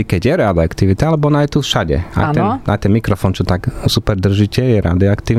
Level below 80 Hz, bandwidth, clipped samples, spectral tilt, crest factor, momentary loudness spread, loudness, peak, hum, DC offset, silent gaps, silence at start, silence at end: -30 dBFS; 15 kHz; under 0.1%; -6.5 dB/octave; 12 dB; 3 LU; -15 LUFS; -2 dBFS; none; under 0.1%; none; 0 s; 0 s